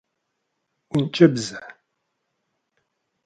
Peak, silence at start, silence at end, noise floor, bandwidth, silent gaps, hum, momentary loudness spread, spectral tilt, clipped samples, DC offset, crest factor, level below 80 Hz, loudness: 0 dBFS; 0.95 s; 1.55 s; -77 dBFS; 9.4 kHz; none; none; 16 LU; -6 dB/octave; under 0.1%; under 0.1%; 24 dB; -64 dBFS; -20 LUFS